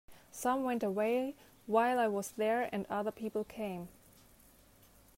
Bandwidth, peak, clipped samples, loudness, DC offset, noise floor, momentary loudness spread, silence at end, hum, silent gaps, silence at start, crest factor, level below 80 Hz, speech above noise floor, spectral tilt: 16 kHz; -16 dBFS; under 0.1%; -35 LUFS; under 0.1%; -63 dBFS; 12 LU; 1.3 s; none; none; 0.1 s; 20 dB; -70 dBFS; 29 dB; -5 dB/octave